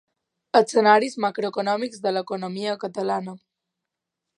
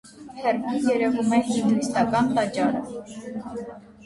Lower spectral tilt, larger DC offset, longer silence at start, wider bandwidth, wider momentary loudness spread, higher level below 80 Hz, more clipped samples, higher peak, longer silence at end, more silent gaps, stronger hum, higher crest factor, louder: about the same, -4.5 dB/octave vs -5.5 dB/octave; neither; first, 0.55 s vs 0.05 s; about the same, 11 kHz vs 11.5 kHz; second, 11 LU vs 15 LU; second, -78 dBFS vs -58 dBFS; neither; first, -2 dBFS vs -8 dBFS; first, 1 s vs 0 s; neither; neither; first, 22 dB vs 16 dB; about the same, -23 LUFS vs -23 LUFS